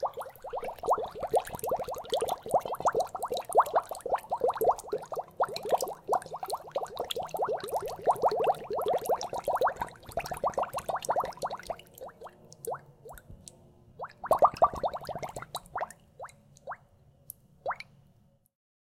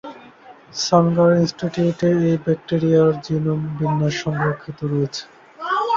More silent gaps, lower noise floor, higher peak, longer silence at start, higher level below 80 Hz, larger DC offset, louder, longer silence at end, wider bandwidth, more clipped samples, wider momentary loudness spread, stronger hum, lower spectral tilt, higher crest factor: neither; first, -64 dBFS vs -44 dBFS; second, -10 dBFS vs -2 dBFS; about the same, 0 s vs 0.05 s; second, -60 dBFS vs -54 dBFS; neither; second, -32 LUFS vs -19 LUFS; first, 1.05 s vs 0 s; first, 17 kHz vs 7.6 kHz; neither; first, 20 LU vs 10 LU; neither; second, -3.5 dB/octave vs -6.5 dB/octave; about the same, 22 dB vs 18 dB